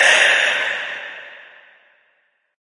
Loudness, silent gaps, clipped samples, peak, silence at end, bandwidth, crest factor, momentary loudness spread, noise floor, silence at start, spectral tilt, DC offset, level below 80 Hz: -15 LUFS; none; under 0.1%; -2 dBFS; 1.2 s; 11.5 kHz; 18 dB; 23 LU; -64 dBFS; 0 s; 2 dB/octave; under 0.1%; -80 dBFS